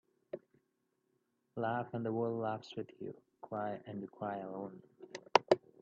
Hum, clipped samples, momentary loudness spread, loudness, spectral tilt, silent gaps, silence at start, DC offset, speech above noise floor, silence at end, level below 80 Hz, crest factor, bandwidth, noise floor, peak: none; under 0.1%; 18 LU; -38 LUFS; -4 dB/octave; none; 0.35 s; under 0.1%; 41 dB; 0.25 s; -82 dBFS; 30 dB; 7 kHz; -82 dBFS; -8 dBFS